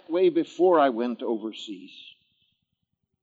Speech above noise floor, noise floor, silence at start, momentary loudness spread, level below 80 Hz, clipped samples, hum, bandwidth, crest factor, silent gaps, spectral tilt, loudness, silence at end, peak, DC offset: 55 dB; -79 dBFS; 0.1 s; 19 LU; -90 dBFS; under 0.1%; none; 7.6 kHz; 18 dB; none; -6 dB/octave; -24 LUFS; 1.35 s; -8 dBFS; under 0.1%